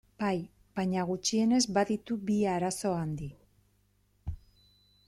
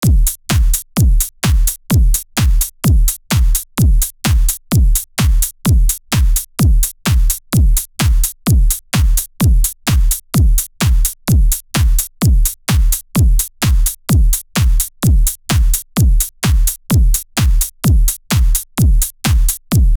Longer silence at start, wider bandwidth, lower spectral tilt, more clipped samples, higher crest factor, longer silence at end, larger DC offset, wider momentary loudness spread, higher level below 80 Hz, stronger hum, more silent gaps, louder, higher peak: first, 0.2 s vs 0 s; second, 13.5 kHz vs over 20 kHz; about the same, -5 dB/octave vs -4.5 dB/octave; neither; first, 18 dB vs 12 dB; first, 0.7 s vs 0 s; neither; first, 18 LU vs 2 LU; second, -56 dBFS vs -14 dBFS; first, 50 Hz at -60 dBFS vs none; neither; second, -31 LUFS vs -15 LUFS; second, -14 dBFS vs 0 dBFS